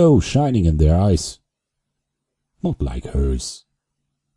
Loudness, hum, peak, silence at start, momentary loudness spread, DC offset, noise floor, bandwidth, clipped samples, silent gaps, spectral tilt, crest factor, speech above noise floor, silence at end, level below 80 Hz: -19 LUFS; none; -4 dBFS; 0 s; 13 LU; under 0.1%; -79 dBFS; 11.5 kHz; under 0.1%; none; -7 dB/octave; 16 dB; 62 dB; 0.8 s; -28 dBFS